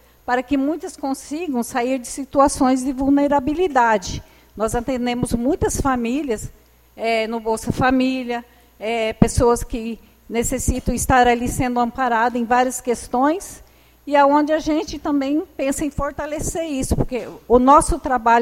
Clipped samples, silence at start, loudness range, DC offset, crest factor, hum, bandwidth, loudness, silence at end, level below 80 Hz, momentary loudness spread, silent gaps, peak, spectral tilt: under 0.1%; 0.3 s; 3 LU; under 0.1%; 18 dB; none; 16.5 kHz; -20 LUFS; 0 s; -34 dBFS; 11 LU; none; 0 dBFS; -5 dB/octave